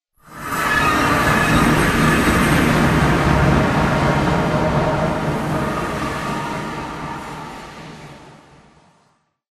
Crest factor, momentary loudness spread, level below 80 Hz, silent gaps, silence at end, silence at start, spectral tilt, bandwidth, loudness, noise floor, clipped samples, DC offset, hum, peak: 16 dB; 16 LU; -30 dBFS; none; 1.2 s; 0.3 s; -5.5 dB/octave; 14 kHz; -17 LUFS; -62 dBFS; under 0.1%; under 0.1%; none; -2 dBFS